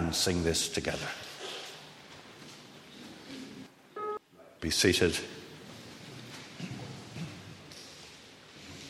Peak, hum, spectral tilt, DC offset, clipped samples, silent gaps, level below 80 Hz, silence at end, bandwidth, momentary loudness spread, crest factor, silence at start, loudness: -10 dBFS; none; -3.5 dB/octave; under 0.1%; under 0.1%; none; -56 dBFS; 0 s; 16 kHz; 21 LU; 26 dB; 0 s; -32 LUFS